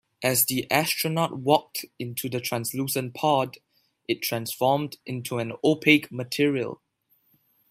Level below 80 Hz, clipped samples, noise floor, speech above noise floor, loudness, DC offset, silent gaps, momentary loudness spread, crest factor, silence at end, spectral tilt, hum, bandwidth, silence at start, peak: -68 dBFS; under 0.1%; -68 dBFS; 43 dB; -25 LUFS; under 0.1%; none; 12 LU; 22 dB; 0.95 s; -4 dB/octave; none; 16 kHz; 0.2 s; -4 dBFS